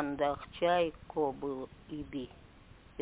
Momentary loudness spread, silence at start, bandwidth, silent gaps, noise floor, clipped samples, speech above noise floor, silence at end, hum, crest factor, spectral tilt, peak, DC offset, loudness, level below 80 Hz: 15 LU; 0 s; 4 kHz; none; -57 dBFS; under 0.1%; 22 dB; 0 s; none; 18 dB; -4 dB/octave; -18 dBFS; under 0.1%; -35 LUFS; -58 dBFS